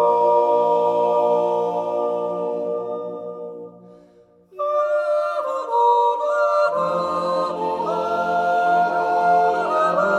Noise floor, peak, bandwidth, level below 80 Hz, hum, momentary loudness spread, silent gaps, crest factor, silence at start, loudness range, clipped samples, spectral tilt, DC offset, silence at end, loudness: -52 dBFS; -6 dBFS; 10.5 kHz; -70 dBFS; none; 10 LU; none; 14 dB; 0 s; 6 LU; under 0.1%; -5.5 dB/octave; under 0.1%; 0 s; -20 LUFS